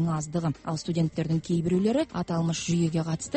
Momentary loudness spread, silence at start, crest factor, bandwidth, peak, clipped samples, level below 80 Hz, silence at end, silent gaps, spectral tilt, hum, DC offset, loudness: 5 LU; 0 s; 12 dB; 8.8 kHz; -14 dBFS; under 0.1%; -54 dBFS; 0 s; none; -6.5 dB/octave; none; under 0.1%; -27 LUFS